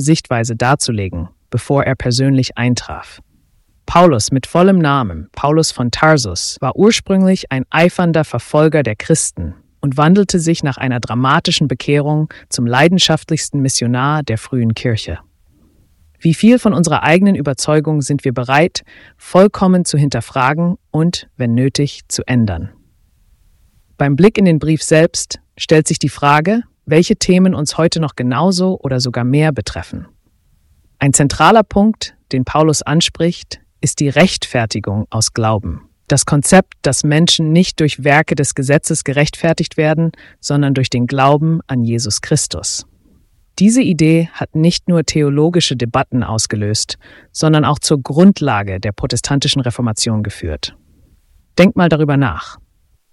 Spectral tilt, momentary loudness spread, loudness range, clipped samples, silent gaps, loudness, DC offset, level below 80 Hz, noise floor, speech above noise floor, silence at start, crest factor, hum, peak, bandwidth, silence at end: -5 dB/octave; 10 LU; 3 LU; under 0.1%; none; -14 LUFS; under 0.1%; -40 dBFS; -55 dBFS; 42 dB; 0 s; 14 dB; none; 0 dBFS; 12 kHz; 0.6 s